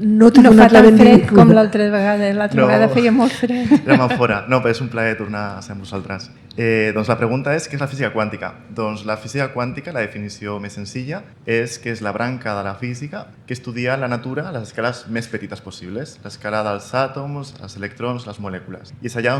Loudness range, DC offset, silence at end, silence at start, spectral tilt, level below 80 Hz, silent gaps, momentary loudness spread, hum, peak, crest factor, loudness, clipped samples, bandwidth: 14 LU; under 0.1%; 0 s; 0 s; -7 dB/octave; -46 dBFS; none; 22 LU; none; 0 dBFS; 16 dB; -15 LUFS; 0.6%; 12 kHz